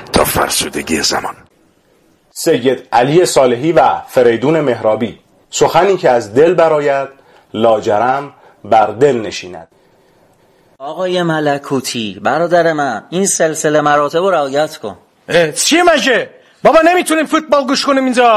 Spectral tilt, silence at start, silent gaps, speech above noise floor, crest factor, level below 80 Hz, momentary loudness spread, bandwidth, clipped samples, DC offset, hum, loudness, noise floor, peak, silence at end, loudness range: -3.5 dB/octave; 0 s; none; 40 dB; 14 dB; -44 dBFS; 10 LU; 15.5 kHz; under 0.1%; under 0.1%; none; -12 LUFS; -52 dBFS; 0 dBFS; 0 s; 5 LU